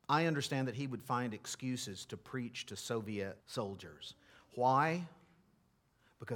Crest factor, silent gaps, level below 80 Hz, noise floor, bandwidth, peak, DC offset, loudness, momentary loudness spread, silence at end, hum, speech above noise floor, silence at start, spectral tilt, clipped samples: 20 dB; none; -78 dBFS; -73 dBFS; 18 kHz; -18 dBFS; under 0.1%; -38 LUFS; 17 LU; 0 s; none; 36 dB; 0.1 s; -5 dB/octave; under 0.1%